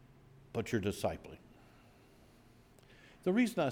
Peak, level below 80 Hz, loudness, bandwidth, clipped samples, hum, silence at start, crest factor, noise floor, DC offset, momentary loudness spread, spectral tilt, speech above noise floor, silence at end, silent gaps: -20 dBFS; -66 dBFS; -36 LUFS; 17 kHz; under 0.1%; none; 0.55 s; 18 dB; -62 dBFS; under 0.1%; 19 LU; -6 dB/octave; 28 dB; 0 s; none